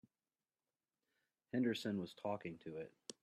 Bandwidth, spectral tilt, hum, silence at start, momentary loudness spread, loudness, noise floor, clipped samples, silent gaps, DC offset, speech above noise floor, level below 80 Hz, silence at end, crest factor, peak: 13 kHz; -5.5 dB/octave; none; 1.55 s; 12 LU; -44 LUFS; under -90 dBFS; under 0.1%; none; under 0.1%; over 48 dB; -86 dBFS; 0.1 s; 20 dB; -26 dBFS